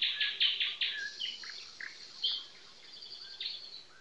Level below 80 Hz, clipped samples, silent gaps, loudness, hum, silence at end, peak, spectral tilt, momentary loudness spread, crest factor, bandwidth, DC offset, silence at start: -84 dBFS; under 0.1%; none; -34 LUFS; none; 0 s; -18 dBFS; 1.5 dB/octave; 19 LU; 20 dB; 11.5 kHz; under 0.1%; 0 s